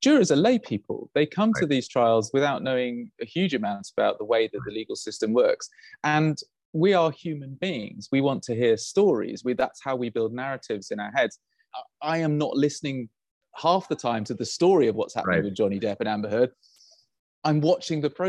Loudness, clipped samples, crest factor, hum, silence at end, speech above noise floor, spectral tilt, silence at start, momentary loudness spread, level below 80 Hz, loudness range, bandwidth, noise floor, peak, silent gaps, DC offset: -25 LUFS; under 0.1%; 16 dB; none; 0 s; 34 dB; -5.5 dB/octave; 0 s; 11 LU; -66 dBFS; 3 LU; 11.5 kHz; -59 dBFS; -8 dBFS; 6.65-6.73 s, 13.31-13.41 s, 17.19-17.42 s; under 0.1%